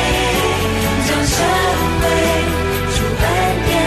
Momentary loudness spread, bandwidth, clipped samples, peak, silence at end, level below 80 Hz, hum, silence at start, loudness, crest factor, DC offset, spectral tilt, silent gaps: 3 LU; 14 kHz; under 0.1%; -4 dBFS; 0 s; -26 dBFS; none; 0 s; -16 LUFS; 12 dB; under 0.1%; -4 dB/octave; none